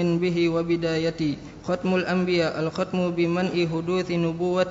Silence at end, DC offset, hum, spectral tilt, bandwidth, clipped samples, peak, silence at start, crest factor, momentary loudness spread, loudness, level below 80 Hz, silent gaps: 0 s; under 0.1%; none; -7 dB/octave; 7.8 kHz; under 0.1%; -10 dBFS; 0 s; 14 dB; 5 LU; -24 LUFS; -54 dBFS; none